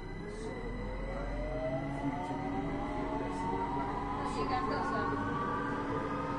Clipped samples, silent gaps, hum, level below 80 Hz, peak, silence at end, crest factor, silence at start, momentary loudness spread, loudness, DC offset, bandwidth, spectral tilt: under 0.1%; none; none; -46 dBFS; -22 dBFS; 0 s; 14 dB; 0 s; 7 LU; -36 LUFS; under 0.1%; 10.5 kHz; -7 dB/octave